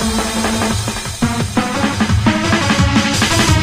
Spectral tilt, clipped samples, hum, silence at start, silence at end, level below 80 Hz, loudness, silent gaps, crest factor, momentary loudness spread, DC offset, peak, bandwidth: -4 dB/octave; under 0.1%; none; 0 s; 0 s; -28 dBFS; -15 LUFS; none; 14 dB; 6 LU; under 0.1%; 0 dBFS; 15.5 kHz